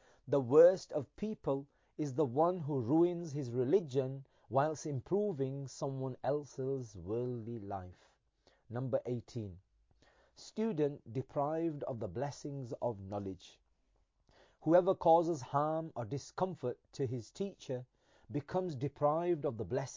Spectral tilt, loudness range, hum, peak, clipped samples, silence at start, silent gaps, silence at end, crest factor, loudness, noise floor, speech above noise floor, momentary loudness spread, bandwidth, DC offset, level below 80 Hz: -7.5 dB/octave; 7 LU; none; -14 dBFS; under 0.1%; 0.25 s; none; 0 s; 20 dB; -36 LUFS; -75 dBFS; 41 dB; 14 LU; 7.6 kHz; under 0.1%; -68 dBFS